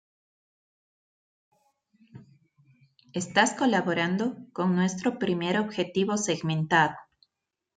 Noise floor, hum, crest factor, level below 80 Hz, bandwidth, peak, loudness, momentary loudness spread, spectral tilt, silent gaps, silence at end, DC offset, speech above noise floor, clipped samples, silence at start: -86 dBFS; none; 22 dB; -70 dBFS; 9.4 kHz; -8 dBFS; -26 LUFS; 7 LU; -4.5 dB/octave; none; 0.75 s; under 0.1%; 60 dB; under 0.1%; 2.15 s